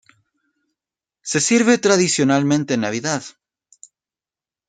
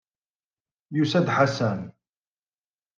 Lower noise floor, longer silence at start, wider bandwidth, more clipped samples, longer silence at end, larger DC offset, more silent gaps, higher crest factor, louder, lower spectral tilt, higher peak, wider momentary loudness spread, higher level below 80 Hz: about the same, under -90 dBFS vs under -90 dBFS; first, 1.25 s vs 0.9 s; first, 9.6 kHz vs 7.6 kHz; neither; first, 1.4 s vs 1.05 s; neither; neither; about the same, 20 dB vs 22 dB; first, -17 LUFS vs -24 LUFS; second, -4 dB/octave vs -6.5 dB/octave; first, -2 dBFS vs -6 dBFS; about the same, 11 LU vs 12 LU; first, -64 dBFS vs -72 dBFS